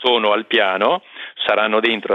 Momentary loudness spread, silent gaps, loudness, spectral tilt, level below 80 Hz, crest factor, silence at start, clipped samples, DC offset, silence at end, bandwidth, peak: 8 LU; none; -17 LUFS; -5.5 dB/octave; -68 dBFS; 16 dB; 0 s; under 0.1%; under 0.1%; 0 s; 6.8 kHz; -2 dBFS